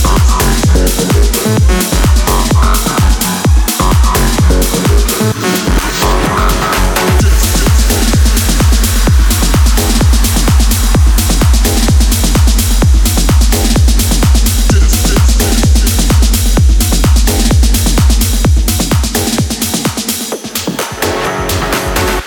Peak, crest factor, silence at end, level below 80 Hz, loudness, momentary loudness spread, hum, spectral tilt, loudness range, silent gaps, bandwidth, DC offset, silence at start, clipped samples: 0 dBFS; 8 dB; 0 s; -10 dBFS; -10 LUFS; 3 LU; none; -4.5 dB/octave; 2 LU; none; 20 kHz; under 0.1%; 0 s; under 0.1%